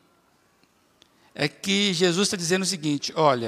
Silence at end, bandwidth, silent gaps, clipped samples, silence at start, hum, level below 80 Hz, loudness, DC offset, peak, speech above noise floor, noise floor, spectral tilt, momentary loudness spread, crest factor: 0 s; 15.5 kHz; none; under 0.1%; 1.35 s; none; -72 dBFS; -23 LUFS; under 0.1%; -6 dBFS; 40 dB; -63 dBFS; -3.5 dB/octave; 7 LU; 20 dB